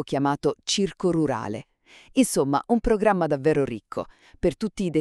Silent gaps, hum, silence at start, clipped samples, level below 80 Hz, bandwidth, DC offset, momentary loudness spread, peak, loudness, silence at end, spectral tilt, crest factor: none; none; 0 s; under 0.1%; -44 dBFS; 13.5 kHz; under 0.1%; 12 LU; -6 dBFS; -24 LUFS; 0 s; -5 dB/octave; 18 dB